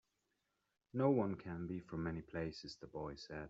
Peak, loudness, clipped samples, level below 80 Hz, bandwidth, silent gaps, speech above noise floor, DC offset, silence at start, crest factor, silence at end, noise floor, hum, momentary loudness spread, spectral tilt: -22 dBFS; -42 LUFS; under 0.1%; -66 dBFS; 7.8 kHz; none; 44 dB; under 0.1%; 0.95 s; 20 dB; 0 s; -86 dBFS; none; 13 LU; -6.5 dB/octave